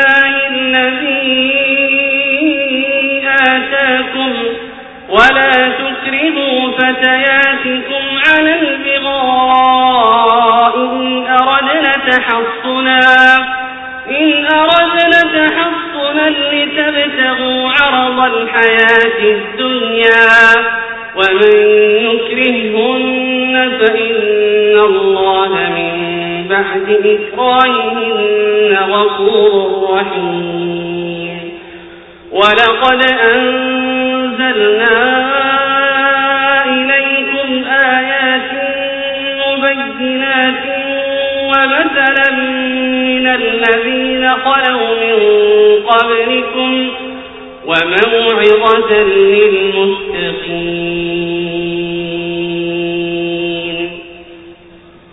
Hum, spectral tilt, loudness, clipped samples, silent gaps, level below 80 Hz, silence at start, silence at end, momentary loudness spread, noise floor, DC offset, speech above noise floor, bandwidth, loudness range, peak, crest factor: none; -5 dB/octave; -10 LUFS; 0.1%; none; -48 dBFS; 0 s; 0.6 s; 9 LU; -39 dBFS; under 0.1%; 29 dB; 8 kHz; 5 LU; 0 dBFS; 12 dB